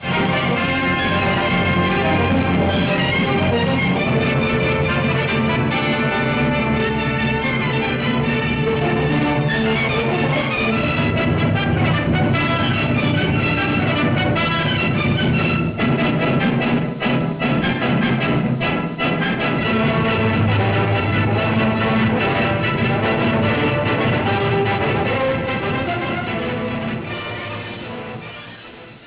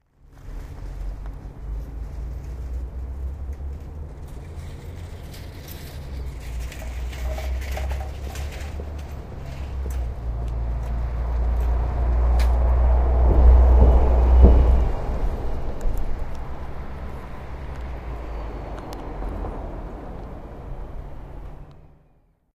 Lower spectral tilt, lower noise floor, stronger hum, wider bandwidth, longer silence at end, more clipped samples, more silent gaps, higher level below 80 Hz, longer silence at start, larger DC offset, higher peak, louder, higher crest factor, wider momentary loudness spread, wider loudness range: first, -10 dB/octave vs -8 dB/octave; second, -39 dBFS vs -59 dBFS; neither; second, 4 kHz vs 7.6 kHz; second, 0 s vs 0.75 s; neither; neither; second, -36 dBFS vs -22 dBFS; second, 0 s vs 0.3 s; neither; second, -10 dBFS vs 0 dBFS; first, -18 LUFS vs -24 LUFS; second, 8 dB vs 22 dB; second, 4 LU vs 20 LU; second, 2 LU vs 17 LU